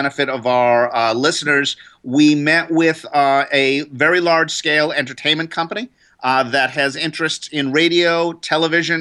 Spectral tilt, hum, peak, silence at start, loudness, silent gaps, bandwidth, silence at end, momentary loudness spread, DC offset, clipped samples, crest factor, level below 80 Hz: -4 dB/octave; none; -2 dBFS; 0 s; -16 LUFS; none; 11.5 kHz; 0 s; 7 LU; under 0.1%; under 0.1%; 14 dB; -66 dBFS